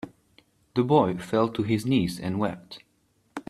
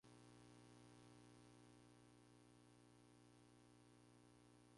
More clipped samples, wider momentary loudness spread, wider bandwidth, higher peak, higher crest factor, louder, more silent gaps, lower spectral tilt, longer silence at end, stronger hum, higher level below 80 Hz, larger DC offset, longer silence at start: neither; first, 21 LU vs 3 LU; first, 14 kHz vs 11.5 kHz; first, -6 dBFS vs -54 dBFS; first, 20 dB vs 14 dB; first, -25 LUFS vs -68 LUFS; neither; first, -7 dB/octave vs -5 dB/octave; about the same, 0.1 s vs 0 s; second, none vs 60 Hz at -75 dBFS; first, -58 dBFS vs -84 dBFS; neither; about the same, 0.05 s vs 0.05 s